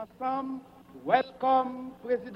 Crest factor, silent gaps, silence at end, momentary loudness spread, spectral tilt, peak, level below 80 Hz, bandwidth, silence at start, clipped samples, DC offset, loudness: 20 dB; none; 0 s; 14 LU; -6.5 dB/octave; -10 dBFS; -68 dBFS; 5.8 kHz; 0 s; under 0.1%; under 0.1%; -29 LUFS